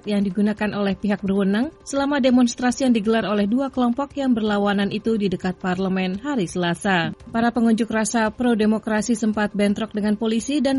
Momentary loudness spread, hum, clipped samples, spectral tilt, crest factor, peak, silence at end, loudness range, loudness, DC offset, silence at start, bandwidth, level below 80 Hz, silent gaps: 5 LU; none; under 0.1%; -5.5 dB/octave; 14 dB; -6 dBFS; 0 s; 2 LU; -21 LUFS; under 0.1%; 0.05 s; 11.5 kHz; -50 dBFS; none